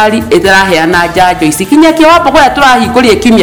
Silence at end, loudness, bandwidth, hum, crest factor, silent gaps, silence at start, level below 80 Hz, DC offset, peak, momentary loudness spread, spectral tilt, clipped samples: 0 s; -5 LUFS; 19 kHz; none; 6 dB; none; 0 s; -30 dBFS; under 0.1%; 0 dBFS; 4 LU; -4 dB/octave; 6%